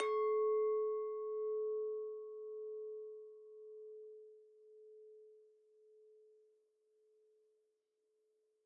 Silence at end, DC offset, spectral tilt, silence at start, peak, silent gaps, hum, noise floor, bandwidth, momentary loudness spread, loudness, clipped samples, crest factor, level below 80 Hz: 2.5 s; under 0.1%; 1 dB/octave; 0 s; -26 dBFS; none; none; -83 dBFS; 4.5 kHz; 25 LU; -40 LUFS; under 0.1%; 18 dB; under -90 dBFS